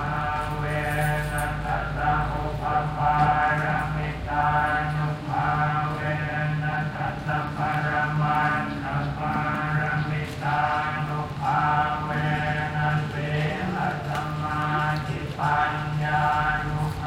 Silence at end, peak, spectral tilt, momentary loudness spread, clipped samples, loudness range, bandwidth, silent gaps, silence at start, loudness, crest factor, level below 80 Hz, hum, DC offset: 0 s; -8 dBFS; -6.5 dB/octave; 6 LU; under 0.1%; 2 LU; 16 kHz; none; 0 s; -25 LUFS; 16 dB; -40 dBFS; none; under 0.1%